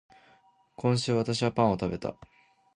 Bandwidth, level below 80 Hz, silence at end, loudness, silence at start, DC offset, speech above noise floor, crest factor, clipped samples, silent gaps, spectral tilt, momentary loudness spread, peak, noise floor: 11 kHz; -56 dBFS; 0.65 s; -28 LUFS; 0.8 s; under 0.1%; 35 dB; 20 dB; under 0.1%; none; -6 dB/octave; 9 LU; -10 dBFS; -63 dBFS